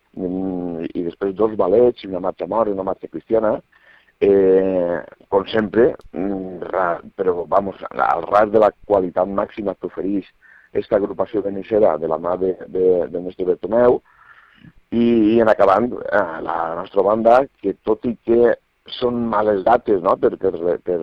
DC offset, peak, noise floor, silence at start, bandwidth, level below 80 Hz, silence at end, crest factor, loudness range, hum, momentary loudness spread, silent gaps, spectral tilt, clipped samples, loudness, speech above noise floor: under 0.1%; -2 dBFS; -49 dBFS; 0.15 s; 5.8 kHz; -50 dBFS; 0 s; 16 dB; 3 LU; none; 11 LU; none; -8.5 dB/octave; under 0.1%; -19 LUFS; 31 dB